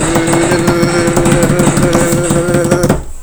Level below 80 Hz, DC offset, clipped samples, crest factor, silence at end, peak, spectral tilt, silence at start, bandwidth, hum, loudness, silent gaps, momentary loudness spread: -26 dBFS; under 0.1%; 0.6%; 10 dB; 0 s; 0 dBFS; -5 dB/octave; 0 s; over 20 kHz; none; -11 LUFS; none; 2 LU